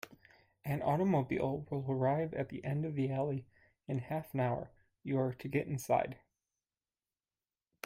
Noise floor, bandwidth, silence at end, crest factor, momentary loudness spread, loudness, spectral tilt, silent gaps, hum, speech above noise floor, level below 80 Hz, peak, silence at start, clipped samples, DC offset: under -90 dBFS; 16 kHz; 1.7 s; 20 dB; 12 LU; -36 LUFS; -8 dB/octave; none; none; over 55 dB; -68 dBFS; -18 dBFS; 0.05 s; under 0.1%; under 0.1%